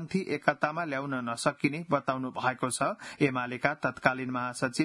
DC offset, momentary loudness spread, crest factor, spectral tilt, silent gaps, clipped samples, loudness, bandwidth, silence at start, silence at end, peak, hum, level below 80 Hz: under 0.1%; 4 LU; 26 dB; -5 dB/octave; none; under 0.1%; -30 LUFS; 12 kHz; 0 s; 0 s; -6 dBFS; none; -68 dBFS